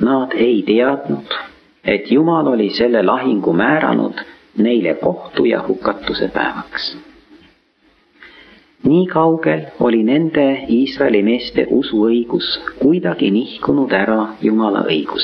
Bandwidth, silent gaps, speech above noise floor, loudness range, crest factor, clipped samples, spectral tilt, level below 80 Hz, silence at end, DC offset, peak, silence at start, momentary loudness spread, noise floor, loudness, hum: 6 kHz; none; 41 dB; 5 LU; 14 dB; under 0.1%; -8.5 dB/octave; -50 dBFS; 0 s; under 0.1%; -2 dBFS; 0 s; 8 LU; -56 dBFS; -16 LUFS; none